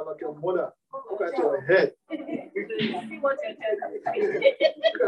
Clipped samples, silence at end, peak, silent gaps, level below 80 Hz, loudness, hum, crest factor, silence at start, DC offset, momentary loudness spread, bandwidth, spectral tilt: under 0.1%; 0 s; -6 dBFS; none; -80 dBFS; -26 LUFS; none; 20 dB; 0 s; under 0.1%; 13 LU; 9 kHz; -6 dB/octave